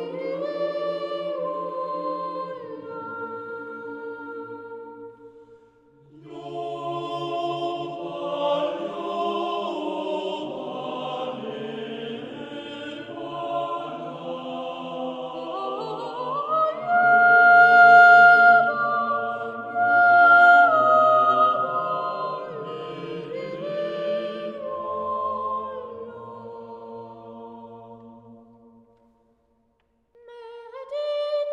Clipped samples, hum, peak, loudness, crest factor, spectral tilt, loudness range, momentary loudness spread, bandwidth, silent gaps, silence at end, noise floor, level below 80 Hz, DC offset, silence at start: under 0.1%; none; -4 dBFS; -20 LUFS; 20 dB; -5.5 dB/octave; 21 LU; 24 LU; 7.4 kHz; none; 0 s; -68 dBFS; -72 dBFS; under 0.1%; 0 s